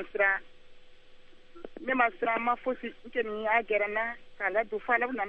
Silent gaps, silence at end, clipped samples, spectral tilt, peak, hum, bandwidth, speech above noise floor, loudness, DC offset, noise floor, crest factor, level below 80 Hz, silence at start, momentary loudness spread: none; 0 s; under 0.1%; -6 dB/octave; -12 dBFS; none; 6 kHz; 21 dB; -30 LUFS; under 0.1%; -50 dBFS; 20 dB; -58 dBFS; 0 s; 9 LU